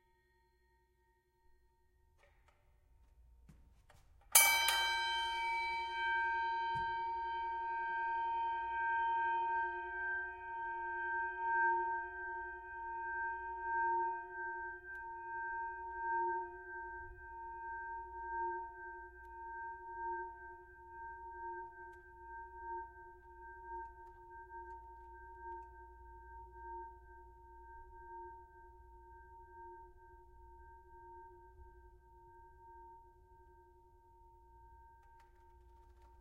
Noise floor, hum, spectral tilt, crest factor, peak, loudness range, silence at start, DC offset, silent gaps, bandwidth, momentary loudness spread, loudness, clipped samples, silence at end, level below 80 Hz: -76 dBFS; none; 0 dB/octave; 32 dB; -10 dBFS; 24 LU; 3.2 s; under 0.1%; none; 16 kHz; 23 LU; -38 LUFS; under 0.1%; 0.05 s; -64 dBFS